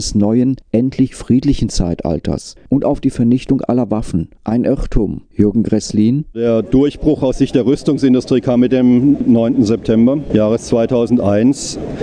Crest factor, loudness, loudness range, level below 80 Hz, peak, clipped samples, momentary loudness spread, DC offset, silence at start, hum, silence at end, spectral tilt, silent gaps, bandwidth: 14 dB; -14 LUFS; 4 LU; -30 dBFS; 0 dBFS; under 0.1%; 7 LU; under 0.1%; 0 s; none; 0 s; -7 dB/octave; none; 10 kHz